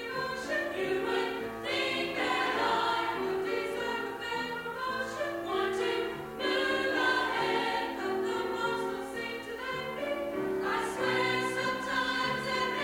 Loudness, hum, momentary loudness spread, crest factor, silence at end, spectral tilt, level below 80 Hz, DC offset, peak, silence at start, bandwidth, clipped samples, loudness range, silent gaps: -31 LUFS; none; 7 LU; 16 dB; 0 s; -3.5 dB/octave; -62 dBFS; under 0.1%; -16 dBFS; 0 s; 16 kHz; under 0.1%; 3 LU; none